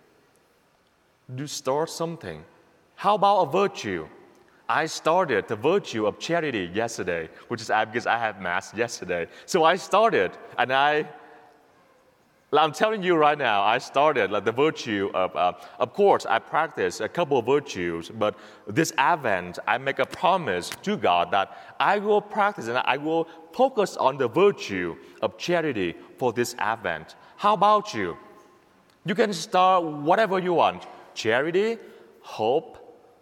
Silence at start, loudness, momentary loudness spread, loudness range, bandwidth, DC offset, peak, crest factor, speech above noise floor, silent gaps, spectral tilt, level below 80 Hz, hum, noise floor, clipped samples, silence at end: 1.3 s; -24 LUFS; 11 LU; 3 LU; 16 kHz; under 0.1%; -2 dBFS; 22 dB; 40 dB; none; -4.5 dB/octave; -68 dBFS; none; -64 dBFS; under 0.1%; 0.3 s